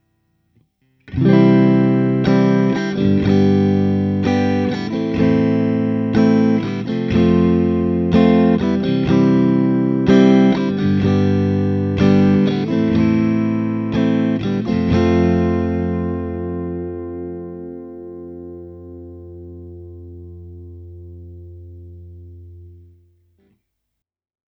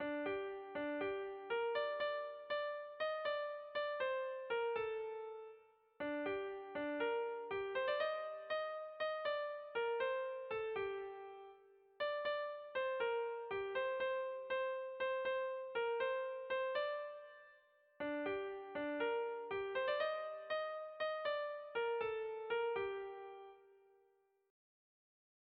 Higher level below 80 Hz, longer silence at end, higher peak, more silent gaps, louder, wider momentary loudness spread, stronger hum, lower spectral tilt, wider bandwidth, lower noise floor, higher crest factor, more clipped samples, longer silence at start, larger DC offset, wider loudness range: first, -42 dBFS vs -80 dBFS; about the same, 1.8 s vs 1.75 s; first, 0 dBFS vs -28 dBFS; neither; first, -16 LUFS vs -42 LUFS; first, 23 LU vs 8 LU; neither; first, -9 dB/octave vs -0.5 dB/octave; first, 6.2 kHz vs 5.4 kHz; about the same, -78 dBFS vs -77 dBFS; about the same, 16 dB vs 14 dB; neither; first, 1.1 s vs 0 s; neither; first, 20 LU vs 2 LU